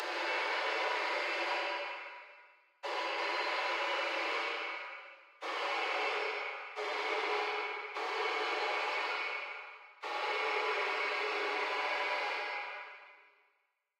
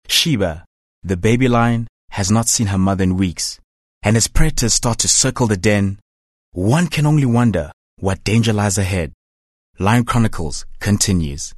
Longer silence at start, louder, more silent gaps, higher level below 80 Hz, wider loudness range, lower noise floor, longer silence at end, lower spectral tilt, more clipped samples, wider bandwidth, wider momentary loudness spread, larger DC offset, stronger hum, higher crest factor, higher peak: about the same, 0 s vs 0.05 s; second, -35 LUFS vs -17 LUFS; second, none vs 0.67-1.02 s, 1.89-2.08 s, 3.64-4.01 s, 6.02-6.52 s, 7.73-7.97 s, 9.14-9.73 s; second, under -90 dBFS vs -28 dBFS; about the same, 2 LU vs 2 LU; second, -79 dBFS vs under -90 dBFS; first, 0.8 s vs 0.05 s; second, 2 dB/octave vs -4.5 dB/octave; neither; first, 16 kHz vs 12.5 kHz; about the same, 12 LU vs 11 LU; neither; neither; about the same, 14 dB vs 16 dB; second, -22 dBFS vs 0 dBFS